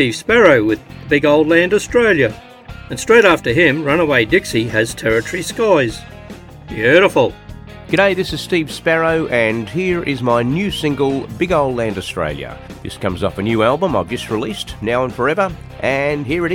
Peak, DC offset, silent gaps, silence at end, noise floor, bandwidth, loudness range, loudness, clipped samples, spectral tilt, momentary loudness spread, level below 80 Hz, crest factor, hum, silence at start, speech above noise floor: 0 dBFS; under 0.1%; none; 0 s; -35 dBFS; 17 kHz; 5 LU; -15 LUFS; under 0.1%; -5 dB/octave; 14 LU; -40 dBFS; 16 dB; none; 0 s; 19 dB